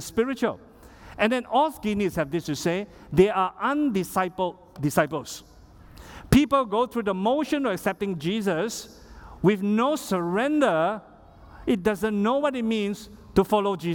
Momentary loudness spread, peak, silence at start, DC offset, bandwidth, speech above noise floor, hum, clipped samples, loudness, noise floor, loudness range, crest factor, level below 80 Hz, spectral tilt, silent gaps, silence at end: 10 LU; -4 dBFS; 0 s; under 0.1%; 18 kHz; 24 dB; none; under 0.1%; -25 LUFS; -49 dBFS; 1 LU; 20 dB; -50 dBFS; -5.5 dB/octave; none; 0 s